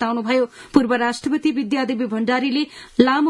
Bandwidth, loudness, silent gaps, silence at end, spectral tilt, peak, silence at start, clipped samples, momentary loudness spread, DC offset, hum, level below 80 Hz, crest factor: 11.5 kHz; -20 LUFS; none; 0 s; -5 dB/octave; 0 dBFS; 0 s; under 0.1%; 5 LU; under 0.1%; none; -56 dBFS; 20 dB